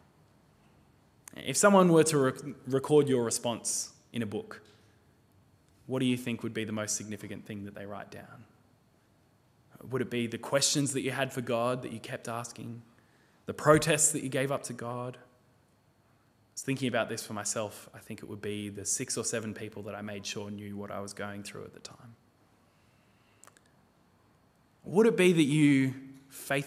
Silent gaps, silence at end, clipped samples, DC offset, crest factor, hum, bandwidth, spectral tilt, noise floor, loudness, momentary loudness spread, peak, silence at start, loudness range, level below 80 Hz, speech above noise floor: none; 0 s; under 0.1%; under 0.1%; 24 dB; none; 16 kHz; -4.5 dB/octave; -66 dBFS; -30 LUFS; 21 LU; -8 dBFS; 1.4 s; 14 LU; -70 dBFS; 36 dB